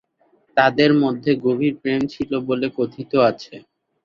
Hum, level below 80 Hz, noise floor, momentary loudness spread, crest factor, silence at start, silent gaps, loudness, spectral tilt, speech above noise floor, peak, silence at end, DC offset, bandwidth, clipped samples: none; -58 dBFS; -61 dBFS; 9 LU; 18 dB; 0.55 s; none; -19 LUFS; -7 dB/octave; 42 dB; -2 dBFS; 0.45 s; under 0.1%; 7 kHz; under 0.1%